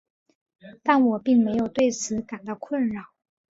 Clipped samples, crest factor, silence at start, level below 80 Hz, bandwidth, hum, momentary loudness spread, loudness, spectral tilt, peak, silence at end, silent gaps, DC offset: under 0.1%; 20 dB; 0.65 s; -62 dBFS; 7.8 kHz; none; 13 LU; -23 LUFS; -5 dB/octave; -4 dBFS; 0.55 s; none; under 0.1%